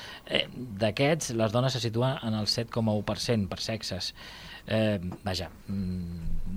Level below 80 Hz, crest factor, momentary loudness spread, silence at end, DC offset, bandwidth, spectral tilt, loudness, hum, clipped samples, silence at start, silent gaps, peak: -42 dBFS; 20 dB; 10 LU; 0 s; under 0.1%; 16 kHz; -5 dB/octave; -30 LUFS; none; under 0.1%; 0 s; none; -10 dBFS